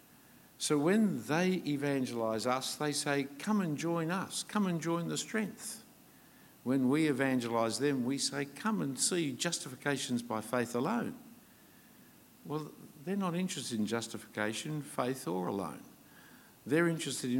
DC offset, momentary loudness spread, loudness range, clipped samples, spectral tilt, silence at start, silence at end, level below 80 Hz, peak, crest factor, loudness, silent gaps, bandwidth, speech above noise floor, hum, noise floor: under 0.1%; 11 LU; 6 LU; under 0.1%; -4.5 dB/octave; 0.6 s; 0 s; -80 dBFS; -16 dBFS; 20 dB; -34 LUFS; none; 17 kHz; 26 dB; none; -60 dBFS